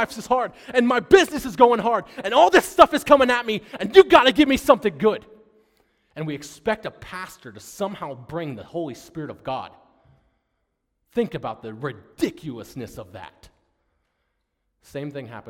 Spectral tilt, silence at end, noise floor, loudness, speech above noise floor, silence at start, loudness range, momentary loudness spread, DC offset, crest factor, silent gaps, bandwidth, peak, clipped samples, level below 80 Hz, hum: -4.5 dB/octave; 0.1 s; -75 dBFS; -19 LUFS; 54 dB; 0 s; 17 LU; 20 LU; under 0.1%; 22 dB; none; 16.5 kHz; 0 dBFS; under 0.1%; -52 dBFS; none